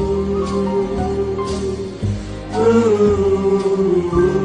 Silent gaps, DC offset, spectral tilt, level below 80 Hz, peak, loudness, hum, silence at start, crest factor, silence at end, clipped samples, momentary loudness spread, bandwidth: none; under 0.1%; -7.5 dB/octave; -32 dBFS; -4 dBFS; -18 LUFS; none; 0 s; 14 dB; 0 s; under 0.1%; 10 LU; 10 kHz